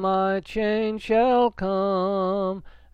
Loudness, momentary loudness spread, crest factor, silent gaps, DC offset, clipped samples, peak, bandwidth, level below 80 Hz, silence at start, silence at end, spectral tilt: -23 LUFS; 6 LU; 12 dB; none; under 0.1%; under 0.1%; -12 dBFS; 9.6 kHz; -48 dBFS; 0 s; 0.25 s; -7.5 dB/octave